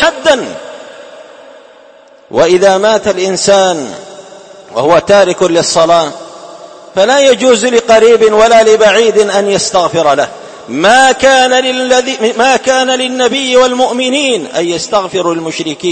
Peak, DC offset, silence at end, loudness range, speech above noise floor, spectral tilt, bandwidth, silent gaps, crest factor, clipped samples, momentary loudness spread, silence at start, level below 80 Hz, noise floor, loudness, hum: 0 dBFS; under 0.1%; 0 s; 4 LU; 31 dB; -3 dB/octave; 11 kHz; none; 10 dB; 0.7%; 13 LU; 0 s; -46 dBFS; -39 dBFS; -9 LUFS; none